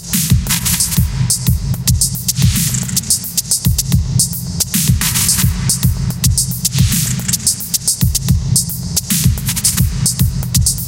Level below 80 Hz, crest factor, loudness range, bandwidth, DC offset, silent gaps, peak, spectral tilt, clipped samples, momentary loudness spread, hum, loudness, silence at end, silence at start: -24 dBFS; 14 dB; 1 LU; 17.5 kHz; under 0.1%; none; 0 dBFS; -3 dB/octave; under 0.1%; 3 LU; none; -14 LUFS; 0 s; 0 s